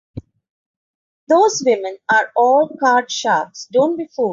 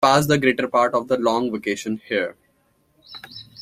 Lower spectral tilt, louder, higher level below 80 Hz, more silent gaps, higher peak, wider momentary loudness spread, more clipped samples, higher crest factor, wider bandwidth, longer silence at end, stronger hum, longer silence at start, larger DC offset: second, -3 dB/octave vs -5 dB/octave; first, -16 LUFS vs -21 LUFS; about the same, -56 dBFS vs -58 dBFS; first, 0.50-1.27 s vs none; about the same, -4 dBFS vs -2 dBFS; second, 6 LU vs 20 LU; neither; second, 14 dB vs 20 dB; second, 7.6 kHz vs 16 kHz; about the same, 0 s vs 0 s; neither; first, 0.15 s vs 0 s; neither